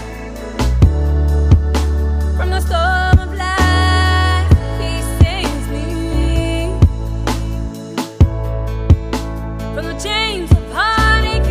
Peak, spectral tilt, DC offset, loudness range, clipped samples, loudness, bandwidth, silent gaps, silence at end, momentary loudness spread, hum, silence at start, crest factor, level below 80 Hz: 0 dBFS; -5.5 dB/octave; under 0.1%; 4 LU; under 0.1%; -16 LUFS; 15 kHz; none; 0 s; 11 LU; none; 0 s; 14 dB; -18 dBFS